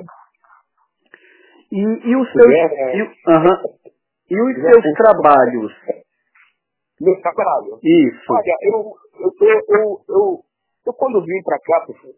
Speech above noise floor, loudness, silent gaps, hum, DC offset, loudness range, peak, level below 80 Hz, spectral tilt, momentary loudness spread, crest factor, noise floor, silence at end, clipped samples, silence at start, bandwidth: 57 dB; -15 LUFS; none; none; under 0.1%; 4 LU; 0 dBFS; -62 dBFS; -10.5 dB/octave; 15 LU; 16 dB; -71 dBFS; 0.25 s; under 0.1%; 0 s; 4 kHz